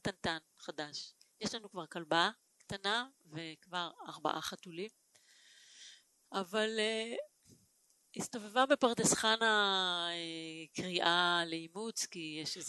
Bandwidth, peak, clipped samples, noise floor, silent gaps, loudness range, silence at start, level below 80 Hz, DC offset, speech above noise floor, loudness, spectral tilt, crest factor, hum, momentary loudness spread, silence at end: 12 kHz; -14 dBFS; under 0.1%; -72 dBFS; none; 9 LU; 0.05 s; -72 dBFS; under 0.1%; 36 dB; -35 LUFS; -2 dB/octave; 22 dB; none; 17 LU; 0 s